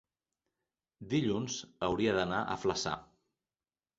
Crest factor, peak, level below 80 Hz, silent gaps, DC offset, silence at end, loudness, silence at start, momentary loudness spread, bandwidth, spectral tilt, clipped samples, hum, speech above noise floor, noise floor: 20 dB; -16 dBFS; -60 dBFS; none; under 0.1%; 0.95 s; -34 LUFS; 1 s; 8 LU; 8 kHz; -4.5 dB/octave; under 0.1%; none; over 57 dB; under -90 dBFS